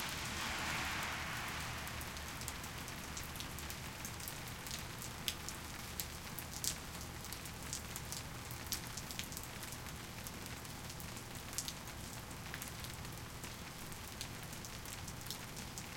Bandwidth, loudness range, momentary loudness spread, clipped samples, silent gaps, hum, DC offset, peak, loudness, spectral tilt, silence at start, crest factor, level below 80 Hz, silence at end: 17 kHz; 4 LU; 7 LU; under 0.1%; none; none; under 0.1%; -12 dBFS; -44 LUFS; -2.5 dB/octave; 0 s; 34 dB; -56 dBFS; 0 s